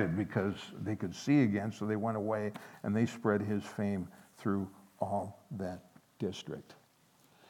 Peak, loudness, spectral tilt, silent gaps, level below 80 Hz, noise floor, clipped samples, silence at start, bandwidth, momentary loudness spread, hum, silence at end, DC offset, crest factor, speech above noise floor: -16 dBFS; -35 LUFS; -7 dB/octave; none; -74 dBFS; -67 dBFS; under 0.1%; 0 s; 16.5 kHz; 13 LU; none; 0.75 s; under 0.1%; 20 dB; 33 dB